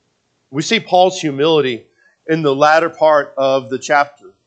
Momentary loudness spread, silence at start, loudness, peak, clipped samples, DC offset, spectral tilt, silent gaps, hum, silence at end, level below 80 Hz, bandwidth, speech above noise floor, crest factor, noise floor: 11 LU; 0.5 s; -15 LUFS; 0 dBFS; under 0.1%; under 0.1%; -4.5 dB/octave; none; none; 0.2 s; -68 dBFS; 8.8 kHz; 50 dB; 16 dB; -64 dBFS